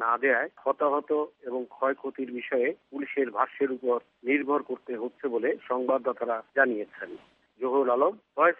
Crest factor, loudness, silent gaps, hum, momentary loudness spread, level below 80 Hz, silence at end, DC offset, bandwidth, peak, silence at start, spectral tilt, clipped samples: 20 dB; -28 LUFS; none; none; 10 LU; -84 dBFS; 0.05 s; under 0.1%; 3.9 kHz; -8 dBFS; 0 s; -8 dB/octave; under 0.1%